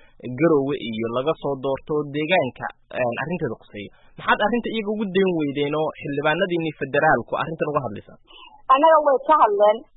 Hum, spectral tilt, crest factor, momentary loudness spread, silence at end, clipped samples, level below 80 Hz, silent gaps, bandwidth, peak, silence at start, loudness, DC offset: none; -10.5 dB/octave; 16 dB; 14 LU; 0.15 s; under 0.1%; -54 dBFS; none; 4.1 kHz; -4 dBFS; 0.25 s; -21 LUFS; under 0.1%